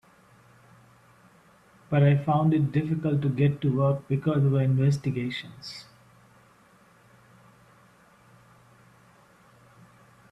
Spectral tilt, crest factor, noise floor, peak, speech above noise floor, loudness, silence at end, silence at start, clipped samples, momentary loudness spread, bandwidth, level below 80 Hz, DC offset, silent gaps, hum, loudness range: -8.5 dB/octave; 18 dB; -58 dBFS; -10 dBFS; 34 dB; -25 LUFS; 4.5 s; 1.9 s; under 0.1%; 14 LU; 8.2 kHz; -62 dBFS; under 0.1%; none; none; 11 LU